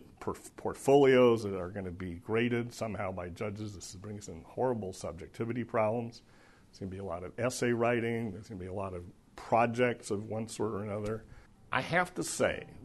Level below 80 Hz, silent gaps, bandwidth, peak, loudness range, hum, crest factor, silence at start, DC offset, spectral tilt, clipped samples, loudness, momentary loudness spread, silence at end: -60 dBFS; none; 12 kHz; -12 dBFS; 7 LU; none; 20 dB; 0 s; under 0.1%; -5.5 dB/octave; under 0.1%; -32 LUFS; 16 LU; 0 s